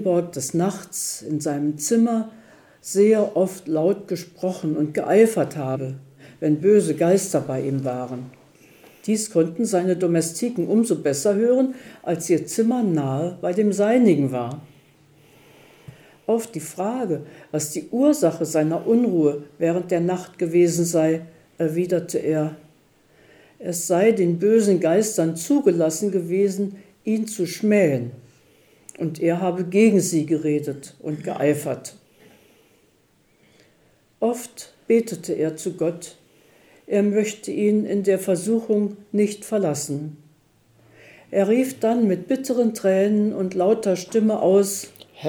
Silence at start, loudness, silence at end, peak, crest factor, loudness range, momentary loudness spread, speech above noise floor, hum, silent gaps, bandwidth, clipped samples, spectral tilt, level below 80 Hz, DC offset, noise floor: 0 s; -21 LUFS; 0 s; -4 dBFS; 18 dB; 6 LU; 12 LU; 40 dB; none; none; 19.5 kHz; under 0.1%; -6 dB/octave; -70 dBFS; under 0.1%; -61 dBFS